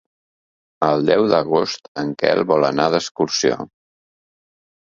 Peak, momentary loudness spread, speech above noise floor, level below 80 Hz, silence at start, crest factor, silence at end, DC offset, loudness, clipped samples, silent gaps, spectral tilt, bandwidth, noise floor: 0 dBFS; 10 LU; over 72 dB; -60 dBFS; 0.8 s; 20 dB; 1.3 s; under 0.1%; -18 LUFS; under 0.1%; 1.88-1.95 s, 3.11-3.15 s; -4.5 dB/octave; 7.6 kHz; under -90 dBFS